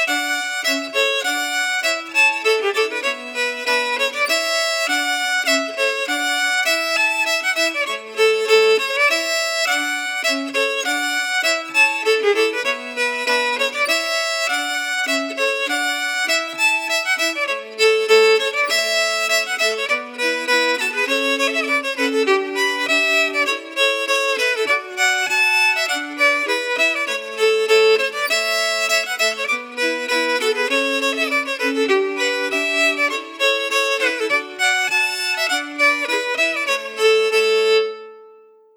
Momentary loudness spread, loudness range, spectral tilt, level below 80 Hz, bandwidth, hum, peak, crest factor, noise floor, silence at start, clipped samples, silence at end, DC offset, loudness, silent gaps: 5 LU; 2 LU; 1 dB/octave; -86 dBFS; over 20 kHz; none; -4 dBFS; 16 dB; -48 dBFS; 0 s; under 0.1%; 0.45 s; under 0.1%; -17 LUFS; none